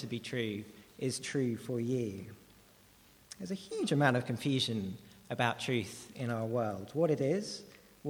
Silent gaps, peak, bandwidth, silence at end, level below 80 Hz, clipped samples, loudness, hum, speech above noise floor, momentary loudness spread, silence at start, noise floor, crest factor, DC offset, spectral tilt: none; -12 dBFS; over 20 kHz; 0 s; -72 dBFS; under 0.1%; -35 LUFS; none; 28 dB; 16 LU; 0 s; -62 dBFS; 24 dB; under 0.1%; -5.5 dB/octave